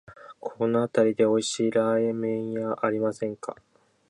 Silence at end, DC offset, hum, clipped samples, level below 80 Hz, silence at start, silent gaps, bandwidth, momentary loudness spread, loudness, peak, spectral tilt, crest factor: 0.55 s; under 0.1%; none; under 0.1%; -70 dBFS; 0.1 s; none; 11 kHz; 14 LU; -25 LUFS; -8 dBFS; -5 dB/octave; 18 dB